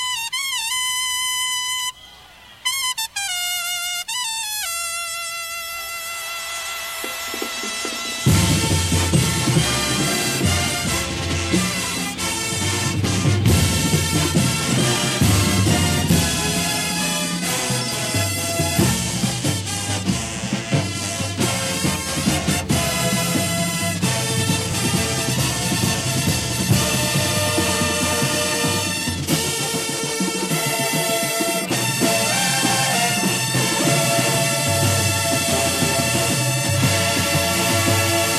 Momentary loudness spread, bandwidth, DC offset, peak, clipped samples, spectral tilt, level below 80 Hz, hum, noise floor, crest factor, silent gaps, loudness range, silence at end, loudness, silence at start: 7 LU; 14.5 kHz; under 0.1%; -4 dBFS; under 0.1%; -3 dB/octave; -40 dBFS; none; -44 dBFS; 18 dB; none; 5 LU; 0 s; -19 LUFS; 0 s